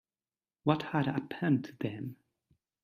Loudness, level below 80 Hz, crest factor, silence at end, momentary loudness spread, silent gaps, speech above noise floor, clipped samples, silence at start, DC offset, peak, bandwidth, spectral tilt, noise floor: -33 LUFS; -72 dBFS; 22 dB; 0.7 s; 10 LU; none; over 58 dB; under 0.1%; 0.65 s; under 0.1%; -12 dBFS; 14 kHz; -8.5 dB/octave; under -90 dBFS